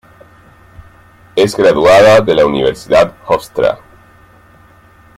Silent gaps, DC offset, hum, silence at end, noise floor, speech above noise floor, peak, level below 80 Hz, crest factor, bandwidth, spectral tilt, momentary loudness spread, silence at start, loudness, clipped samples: none; under 0.1%; none; 1.4 s; -43 dBFS; 34 dB; 0 dBFS; -42 dBFS; 12 dB; 15.5 kHz; -5 dB/octave; 10 LU; 1.35 s; -10 LUFS; under 0.1%